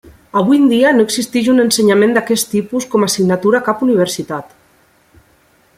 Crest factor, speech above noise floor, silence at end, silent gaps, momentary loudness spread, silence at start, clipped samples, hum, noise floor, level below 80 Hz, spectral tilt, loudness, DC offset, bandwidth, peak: 14 dB; 40 dB; 1.35 s; none; 7 LU; 0.35 s; under 0.1%; none; -53 dBFS; -56 dBFS; -4.5 dB/octave; -13 LUFS; under 0.1%; 16 kHz; 0 dBFS